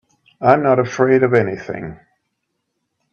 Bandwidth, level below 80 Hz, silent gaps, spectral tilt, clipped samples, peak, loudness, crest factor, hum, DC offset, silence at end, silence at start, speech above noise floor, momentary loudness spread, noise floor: 6.8 kHz; -56 dBFS; none; -7.5 dB/octave; under 0.1%; 0 dBFS; -16 LUFS; 18 dB; none; under 0.1%; 1.2 s; 0.4 s; 58 dB; 15 LU; -74 dBFS